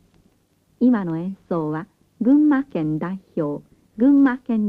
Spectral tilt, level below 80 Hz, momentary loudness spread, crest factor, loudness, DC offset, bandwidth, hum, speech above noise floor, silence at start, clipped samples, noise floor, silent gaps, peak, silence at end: -10 dB/octave; -60 dBFS; 12 LU; 14 dB; -20 LUFS; under 0.1%; 4.3 kHz; none; 43 dB; 0.8 s; under 0.1%; -62 dBFS; none; -8 dBFS; 0 s